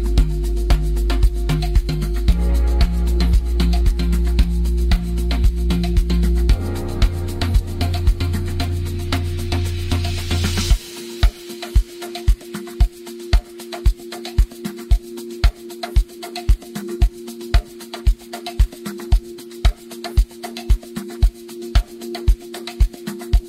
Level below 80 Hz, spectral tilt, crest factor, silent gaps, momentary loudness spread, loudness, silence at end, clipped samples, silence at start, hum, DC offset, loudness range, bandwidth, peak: -18 dBFS; -6 dB/octave; 14 dB; none; 10 LU; -22 LUFS; 0 s; under 0.1%; 0 s; none; under 0.1%; 5 LU; 15.5 kHz; -4 dBFS